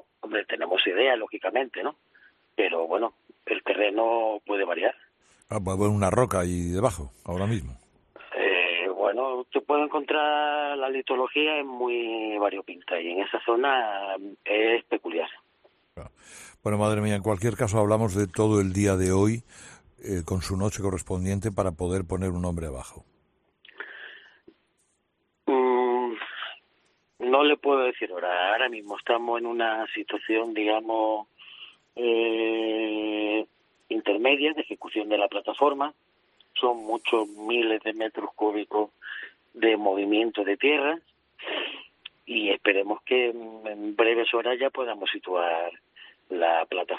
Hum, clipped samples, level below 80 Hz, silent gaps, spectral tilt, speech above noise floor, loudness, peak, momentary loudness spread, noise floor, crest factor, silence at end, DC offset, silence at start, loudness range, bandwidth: none; under 0.1%; -56 dBFS; none; -5 dB/octave; 48 dB; -26 LUFS; -6 dBFS; 13 LU; -74 dBFS; 22 dB; 0 s; under 0.1%; 0.25 s; 4 LU; 13 kHz